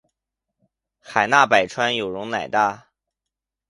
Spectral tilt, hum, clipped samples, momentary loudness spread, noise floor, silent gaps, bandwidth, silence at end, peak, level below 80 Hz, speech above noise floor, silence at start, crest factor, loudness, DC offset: -3.5 dB/octave; none; under 0.1%; 10 LU; -85 dBFS; none; 11.5 kHz; 0.9 s; 0 dBFS; -64 dBFS; 66 dB; 1.1 s; 22 dB; -20 LUFS; under 0.1%